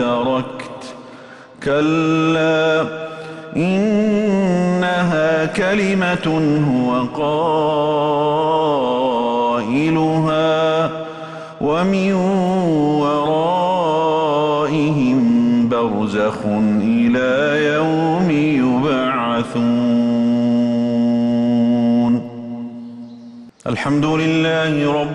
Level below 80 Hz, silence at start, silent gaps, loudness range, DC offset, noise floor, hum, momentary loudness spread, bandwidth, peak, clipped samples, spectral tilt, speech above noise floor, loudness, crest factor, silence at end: -52 dBFS; 0 s; none; 2 LU; under 0.1%; -39 dBFS; none; 11 LU; 10 kHz; -6 dBFS; under 0.1%; -7 dB/octave; 22 dB; -17 LUFS; 10 dB; 0 s